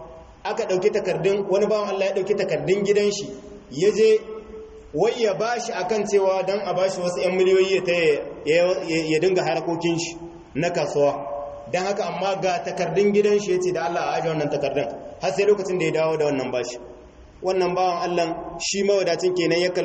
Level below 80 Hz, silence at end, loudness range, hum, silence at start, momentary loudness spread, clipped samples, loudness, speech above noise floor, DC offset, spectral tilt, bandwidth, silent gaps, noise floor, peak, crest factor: -56 dBFS; 0 s; 3 LU; none; 0 s; 11 LU; under 0.1%; -22 LUFS; 24 dB; under 0.1%; -4.5 dB/octave; 8.4 kHz; none; -45 dBFS; -8 dBFS; 14 dB